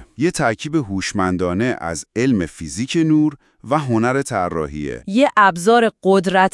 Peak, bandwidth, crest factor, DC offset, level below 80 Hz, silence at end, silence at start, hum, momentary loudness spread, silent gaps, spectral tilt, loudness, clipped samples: 0 dBFS; 12 kHz; 18 dB; under 0.1%; -48 dBFS; 0.05 s; 0 s; none; 10 LU; none; -5.5 dB/octave; -18 LUFS; under 0.1%